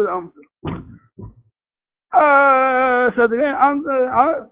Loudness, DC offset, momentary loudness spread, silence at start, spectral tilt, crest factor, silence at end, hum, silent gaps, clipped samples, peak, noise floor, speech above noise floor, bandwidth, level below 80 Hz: -15 LUFS; under 0.1%; 18 LU; 0 s; -9 dB/octave; 16 dB; 0.05 s; none; none; under 0.1%; 0 dBFS; under -90 dBFS; over 75 dB; 4 kHz; -50 dBFS